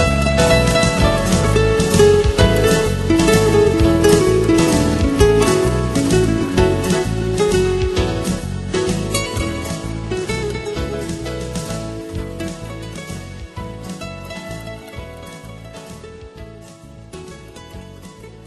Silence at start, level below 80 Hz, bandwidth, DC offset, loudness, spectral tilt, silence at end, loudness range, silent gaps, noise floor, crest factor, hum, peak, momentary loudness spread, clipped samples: 0 s; -28 dBFS; 12.5 kHz; under 0.1%; -16 LUFS; -5.5 dB/octave; 0.05 s; 19 LU; none; -39 dBFS; 18 dB; none; 0 dBFS; 22 LU; under 0.1%